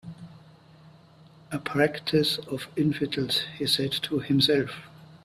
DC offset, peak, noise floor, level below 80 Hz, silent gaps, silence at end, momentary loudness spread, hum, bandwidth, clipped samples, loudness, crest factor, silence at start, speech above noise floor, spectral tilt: under 0.1%; -8 dBFS; -53 dBFS; -62 dBFS; none; 0.1 s; 13 LU; none; 14.5 kHz; under 0.1%; -26 LUFS; 20 dB; 0.05 s; 27 dB; -5 dB/octave